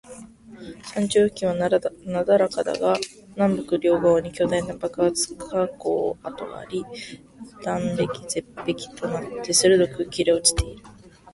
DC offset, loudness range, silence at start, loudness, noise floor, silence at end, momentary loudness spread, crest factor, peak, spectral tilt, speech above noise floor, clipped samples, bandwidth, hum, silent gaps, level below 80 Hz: under 0.1%; 6 LU; 0.1 s; -23 LUFS; -43 dBFS; 0.45 s; 15 LU; 22 dB; -2 dBFS; -4 dB/octave; 20 dB; under 0.1%; 12 kHz; none; none; -44 dBFS